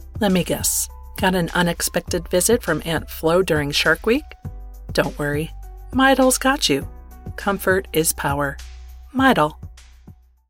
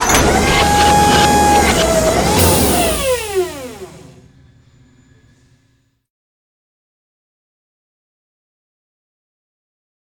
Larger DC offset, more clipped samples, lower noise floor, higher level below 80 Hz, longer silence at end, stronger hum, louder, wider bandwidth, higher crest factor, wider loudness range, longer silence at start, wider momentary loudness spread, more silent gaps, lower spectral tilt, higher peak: neither; neither; second, -47 dBFS vs -59 dBFS; second, -38 dBFS vs -30 dBFS; second, 0.4 s vs 6.1 s; neither; second, -20 LUFS vs -12 LUFS; second, 17 kHz vs 19.5 kHz; about the same, 16 dB vs 16 dB; second, 2 LU vs 14 LU; about the same, 0 s vs 0 s; first, 18 LU vs 11 LU; neither; about the same, -3.5 dB/octave vs -3.5 dB/octave; second, -4 dBFS vs 0 dBFS